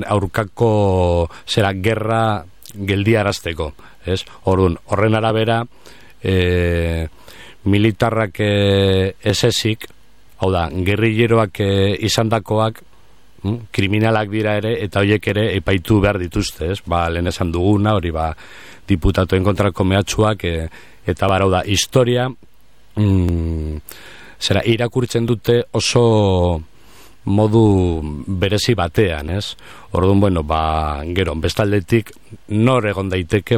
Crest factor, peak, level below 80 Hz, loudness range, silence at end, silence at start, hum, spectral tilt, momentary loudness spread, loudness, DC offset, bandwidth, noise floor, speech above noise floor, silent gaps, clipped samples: 14 dB; -2 dBFS; -34 dBFS; 2 LU; 0 s; 0 s; none; -6 dB/octave; 10 LU; -17 LUFS; 0.9%; 15.5 kHz; -52 dBFS; 35 dB; none; under 0.1%